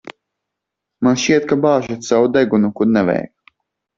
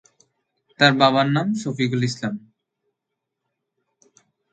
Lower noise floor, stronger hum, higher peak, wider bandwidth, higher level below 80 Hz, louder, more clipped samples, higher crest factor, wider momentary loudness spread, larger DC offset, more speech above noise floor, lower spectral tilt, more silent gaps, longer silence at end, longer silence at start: about the same, -80 dBFS vs -81 dBFS; neither; about the same, -2 dBFS vs 0 dBFS; second, 7.6 kHz vs 9.2 kHz; first, -56 dBFS vs -66 dBFS; first, -16 LUFS vs -20 LUFS; neither; second, 16 dB vs 24 dB; second, 5 LU vs 14 LU; neither; about the same, 65 dB vs 62 dB; about the same, -5.5 dB/octave vs -5.5 dB/octave; neither; second, 0.7 s vs 2.15 s; second, 0.05 s vs 0.8 s